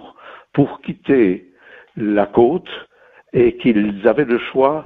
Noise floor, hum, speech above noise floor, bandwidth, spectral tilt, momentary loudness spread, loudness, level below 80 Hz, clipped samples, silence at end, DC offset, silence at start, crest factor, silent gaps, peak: -41 dBFS; none; 25 dB; 4.1 kHz; -10 dB/octave; 13 LU; -17 LUFS; -50 dBFS; under 0.1%; 0 s; under 0.1%; 0.05 s; 16 dB; none; 0 dBFS